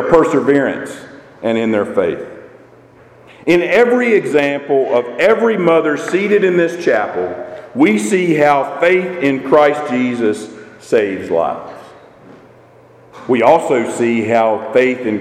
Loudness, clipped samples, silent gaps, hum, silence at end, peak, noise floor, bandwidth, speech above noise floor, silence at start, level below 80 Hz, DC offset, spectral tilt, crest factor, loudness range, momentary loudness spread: -14 LUFS; under 0.1%; none; none; 0 s; 0 dBFS; -44 dBFS; 14 kHz; 30 dB; 0 s; -52 dBFS; under 0.1%; -5.5 dB/octave; 14 dB; 5 LU; 12 LU